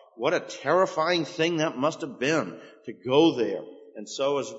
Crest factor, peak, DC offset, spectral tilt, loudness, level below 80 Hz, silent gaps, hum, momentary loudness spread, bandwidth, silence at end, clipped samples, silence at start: 20 dB; -6 dBFS; under 0.1%; -4.5 dB/octave; -25 LUFS; -76 dBFS; none; none; 16 LU; 8 kHz; 0 s; under 0.1%; 0.2 s